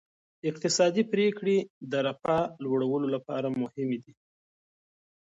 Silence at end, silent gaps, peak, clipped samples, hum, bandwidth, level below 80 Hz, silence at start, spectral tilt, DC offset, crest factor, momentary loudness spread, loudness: 1.2 s; 1.70-1.81 s; -12 dBFS; under 0.1%; none; 8 kHz; -70 dBFS; 0.45 s; -5 dB/octave; under 0.1%; 18 dB; 8 LU; -29 LUFS